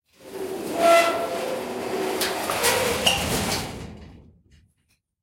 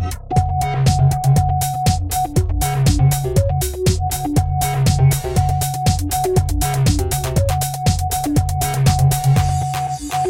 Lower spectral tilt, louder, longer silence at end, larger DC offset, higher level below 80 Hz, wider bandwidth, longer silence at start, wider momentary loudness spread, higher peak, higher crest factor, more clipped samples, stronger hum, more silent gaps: second, -2.5 dB/octave vs -5.5 dB/octave; second, -23 LUFS vs -17 LUFS; first, 1 s vs 0 s; neither; second, -48 dBFS vs -26 dBFS; about the same, 16.5 kHz vs 17 kHz; first, 0.2 s vs 0 s; first, 17 LU vs 5 LU; about the same, -4 dBFS vs -2 dBFS; first, 20 dB vs 14 dB; neither; neither; neither